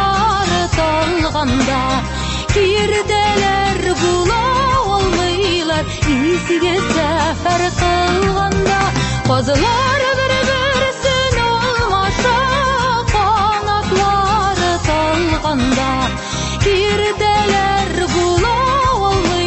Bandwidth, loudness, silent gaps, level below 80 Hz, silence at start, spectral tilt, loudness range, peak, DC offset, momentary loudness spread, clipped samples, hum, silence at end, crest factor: 8.6 kHz; -15 LUFS; none; -26 dBFS; 0 s; -4.5 dB/octave; 1 LU; -2 dBFS; under 0.1%; 3 LU; under 0.1%; none; 0 s; 14 dB